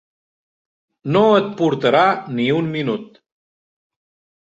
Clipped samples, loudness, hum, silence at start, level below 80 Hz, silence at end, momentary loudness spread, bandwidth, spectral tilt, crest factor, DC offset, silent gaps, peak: under 0.1%; -17 LUFS; none; 1.05 s; -62 dBFS; 1.35 s; 10 LU; 7.8 kHz; -7 dB/octave; 18 dB; under 0.1%; none; -2 dBFS